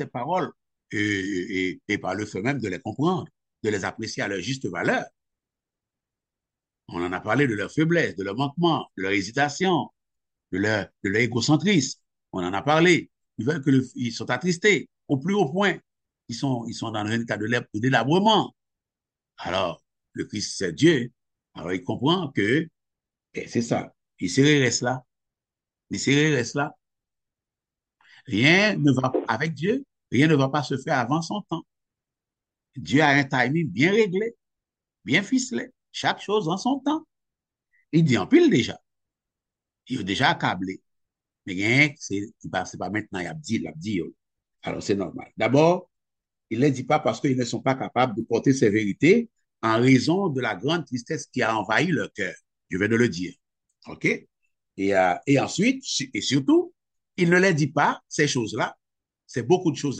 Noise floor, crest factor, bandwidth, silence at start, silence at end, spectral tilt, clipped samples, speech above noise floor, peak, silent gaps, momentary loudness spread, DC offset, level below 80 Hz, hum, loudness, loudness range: -90 dBFS; 20 dB; 9.2 kHz; 0 s; 0 s; -5 dB/octave; under 0.1%; 66 dB; -4 dBFS; none; 14 LU; under 0.1%; -64 dBFS; none; -24 LUFS; 5 LU